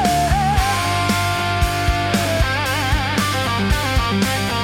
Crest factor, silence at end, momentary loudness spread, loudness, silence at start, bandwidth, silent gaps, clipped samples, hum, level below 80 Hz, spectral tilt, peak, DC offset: 16 dB; 0 s; 2 LU; -18 LUFS; 0 s; 16.5 kHz; none; under 0.1%; none; -26 dBFS; -4.5 dB/octave; -2 dBFS; under 0.1%